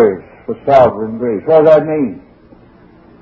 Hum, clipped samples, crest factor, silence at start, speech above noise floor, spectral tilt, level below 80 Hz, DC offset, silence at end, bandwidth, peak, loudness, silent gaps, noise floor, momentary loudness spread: none; 0.3%; 14 dB; 0 s; 32 dB; -8.5 dB/octave; -46 dBFS; under 0.1%; 1 s; 6.6 kHz; 0 dBFS; -12 LUFS; none; -43 dBFS; 14 LU